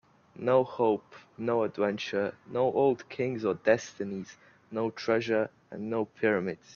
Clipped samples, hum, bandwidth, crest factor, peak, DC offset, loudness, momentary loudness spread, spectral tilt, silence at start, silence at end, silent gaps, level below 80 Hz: under 0.1%; none; 7.2 kHz; 20 dB; -10 dBFS; under 0.1%; -30 LUFS; 10 LU; -6 dB/octave; 0.35 s; 0.2 s; none; -72 dBFS